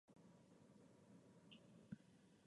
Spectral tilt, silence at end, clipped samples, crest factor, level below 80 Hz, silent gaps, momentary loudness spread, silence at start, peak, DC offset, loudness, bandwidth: -6 dB/octave; 0 s; under 0.1%; 24 dB; -90 dBFS; none; 8 LU; 0.05 s; -42 dBFS; under 0.1%; -66 LUFS; 11 kHz